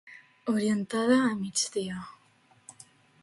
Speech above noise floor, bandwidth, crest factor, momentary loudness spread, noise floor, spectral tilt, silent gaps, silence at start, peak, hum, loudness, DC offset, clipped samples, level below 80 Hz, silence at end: 36 dB; 11.5 kHz; 20 dB; 22 LU; -63 dBFS; -4 dB/octave; none; 0.05 s; -10 dBFS; none; -28 LUFS; under 0.1%; under 0.1%; -70 dBFS; 0.5 s